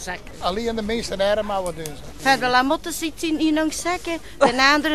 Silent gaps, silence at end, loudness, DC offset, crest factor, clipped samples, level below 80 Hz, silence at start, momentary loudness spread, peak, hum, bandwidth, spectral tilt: none; 0 s; -21 LUFS; 1%; 20 dB; under 0.1%; -42 dBFS; 0 s; 12 LU; -2 dBFS; none; 13.5 kHz; -3 dB/octave